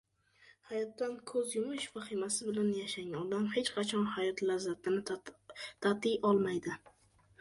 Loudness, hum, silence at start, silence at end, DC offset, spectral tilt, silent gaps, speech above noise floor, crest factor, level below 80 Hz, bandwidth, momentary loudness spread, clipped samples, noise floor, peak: -35 LUFS; none; 0.7 s; 0.65 s; under 0.1%; -4 dB/octave; none; 30 dB; 20 dB; -74 dBFS; 11.5 kHz; 10 LU; under 0.1%; -65 dBFS; -16 dBFS